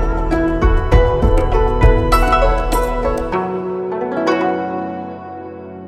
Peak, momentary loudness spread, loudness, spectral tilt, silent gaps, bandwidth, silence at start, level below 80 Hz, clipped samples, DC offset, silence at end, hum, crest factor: 0 dBFS; 13 LU; -16 LUFS; -7 dB/octave; none; 15 kHz; 0 s; -18 dBFS; under 0.1%; under 0.1%; 0 s; none; 14 dB